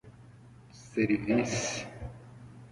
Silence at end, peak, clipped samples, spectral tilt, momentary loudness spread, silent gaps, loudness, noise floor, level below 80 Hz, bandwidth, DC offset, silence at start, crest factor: 0.05 s; -14 dBFS; under 0.1%; -4.5 dB/octave; 23 LU; none; -31 LUFS; -53 dBFS; -56 dBFS; 11.5 kHz; under 0.1%; 0.05 s; 20 dB